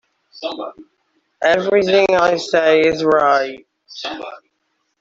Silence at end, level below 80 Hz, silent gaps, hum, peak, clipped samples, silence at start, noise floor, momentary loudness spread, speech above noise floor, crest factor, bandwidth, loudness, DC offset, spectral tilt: 0.65 s; -56 dBFS; none; none; -2 dBFS; under 0.1%; 0.35 s; -69 dBFS; 17 LU; 53 dB; 16 dB; 7.8 kHz; -15 LUFS; under 0.1%; -4.5 dB/octave